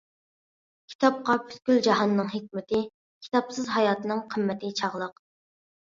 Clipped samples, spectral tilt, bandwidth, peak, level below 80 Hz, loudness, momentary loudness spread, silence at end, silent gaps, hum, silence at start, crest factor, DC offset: under 0.1%; -5 dB/octave; 7.6 kHz; -8 dBFS; -70 dBFS; -27 LUFS; 9 LU; 0.8 s; 0.95-0.99 s, 2.94-3.21 s; none; 0.9 s; 20 dB; under 0.1%